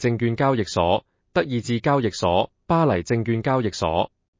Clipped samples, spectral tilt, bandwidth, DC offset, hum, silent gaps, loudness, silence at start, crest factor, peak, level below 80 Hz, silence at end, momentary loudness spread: under 0.1%; -6.5 dB/octave; 7.6 kHz; under 0.1%; none; none; -22 LUFS; 0 s; 16 dB; -6 dBFS; -44 dBFS; 0.35 s; 4 LU